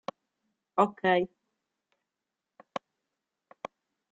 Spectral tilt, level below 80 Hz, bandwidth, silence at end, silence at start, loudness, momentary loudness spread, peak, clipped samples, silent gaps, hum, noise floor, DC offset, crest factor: -3.5 dB/octave; -76 dBFS; 8 kHz; 1.35 s; 0.75 s; -28 LUFS; 20 LU; -10 dBFS; under 0.1%; none; none; -88 dBFS; under 0.1%; 26 dB